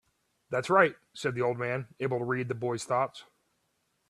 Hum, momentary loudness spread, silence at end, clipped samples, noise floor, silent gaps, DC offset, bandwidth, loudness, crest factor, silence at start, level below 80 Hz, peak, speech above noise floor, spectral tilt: none; 10 LU; 0.85 s; under 0.1%; -76 dBFS; none; under 0.1%; 12.5 kHz; -30 LUFS; 24 dB; 0.5 s; -72 dBFS; -8 dBFS; 46 dB; -5.5 dB/octave